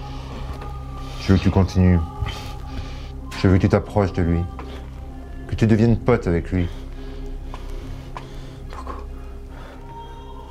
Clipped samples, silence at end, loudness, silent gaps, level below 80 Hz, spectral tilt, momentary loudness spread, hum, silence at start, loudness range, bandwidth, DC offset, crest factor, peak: under 0.1%; 0 s; -21 LUFS; none; -32 dBFS; -8 dB/octave; 20 LU; none; 0 s; 15 LU; 10.5 kHz; under 0.1%; 20 dB; -2 dBFS